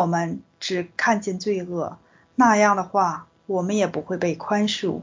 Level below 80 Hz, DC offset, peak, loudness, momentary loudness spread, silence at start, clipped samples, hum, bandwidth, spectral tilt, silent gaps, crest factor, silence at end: -62 dBFS; under 0.1%; -4 dBFS; -23 LUFS; 12 LU; 0 s; under 0.1%; none; 7.6 kHz; -5 dB/octave; none; 18 dB; 0 s